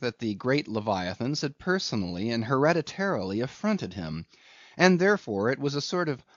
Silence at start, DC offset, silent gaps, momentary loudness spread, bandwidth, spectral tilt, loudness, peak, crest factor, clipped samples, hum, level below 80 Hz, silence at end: 0 s; under 0.1%; none; 8 LU; 7.4 kHz; -4.5 dB/octave; -27 LUFS; -6 dBFS; 22 dB; under 0.1%; none; -62 dBFS; 0.2 s